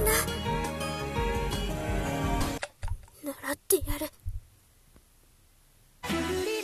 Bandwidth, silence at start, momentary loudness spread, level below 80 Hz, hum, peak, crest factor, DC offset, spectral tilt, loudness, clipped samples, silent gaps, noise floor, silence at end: 14 kHz; 0 s; 13 LU; -38 dBFS; none; -10 dBFS; 22 dB; under 0.1%; -4 dB/octave; -31 LUFS; under 0.1%; none; -60 dBFS; 0 s